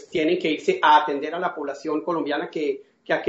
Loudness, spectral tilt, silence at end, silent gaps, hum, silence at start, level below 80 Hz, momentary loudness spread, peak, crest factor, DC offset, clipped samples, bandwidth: -23 LUFS; -2 dB/octave; 0 s; none; none; 0 s; -70 dBFS; 11 LU; -6 dBFS; 18 dB; under 0.1%; under 0.1%; 8 kHz